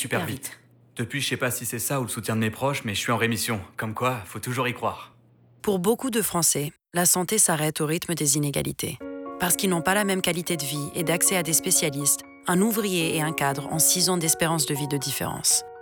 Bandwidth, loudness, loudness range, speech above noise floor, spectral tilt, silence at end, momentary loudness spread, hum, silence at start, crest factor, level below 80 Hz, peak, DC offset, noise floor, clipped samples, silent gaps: over 20 kHz; -24 LUFS; 5 LU; 32 dB; -3 dB/octave; 0 s; 11 LU; none; 0 s; 16 dB; -60 dBFS; -8 dBFS; under 0.1%; -56 dBFS; under 0.1%; none